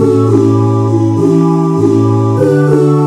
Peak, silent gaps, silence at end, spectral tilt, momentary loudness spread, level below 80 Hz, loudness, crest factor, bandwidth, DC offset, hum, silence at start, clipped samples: 0 dBFS; none; 0 s; -9 dB/octave; 2 LU; -50 dBFS; -10 LUFS; 8 dB; 10 kHz; under 0.1%; none; 0 s; 0.2%